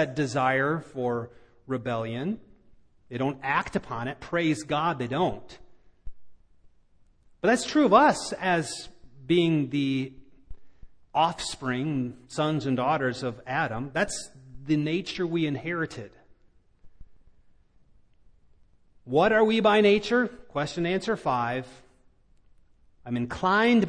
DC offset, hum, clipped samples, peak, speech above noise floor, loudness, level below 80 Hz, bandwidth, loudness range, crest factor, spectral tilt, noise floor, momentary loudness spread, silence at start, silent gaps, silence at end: under 0.1%; none; under 0.1%; -6 dBFS; 35 dB; -26 LUFS; -56 dBFS; 10.5 kHz; 7 LU; 22 dB; -5.5 dB/octave; -60 dBFS; 13 LU; 0 s; none; 0 s